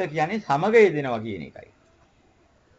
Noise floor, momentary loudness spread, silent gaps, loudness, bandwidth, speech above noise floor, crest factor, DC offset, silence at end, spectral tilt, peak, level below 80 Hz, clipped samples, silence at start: -60 dBFS; 18 LU; none; -21 LUFS; 8 kHz; 38 dB; 18 dB; under 0.1%; 1.3 s; -6.5 dB/octave; -6 dBFS; -60 dBFS; under 0.1%; 0 s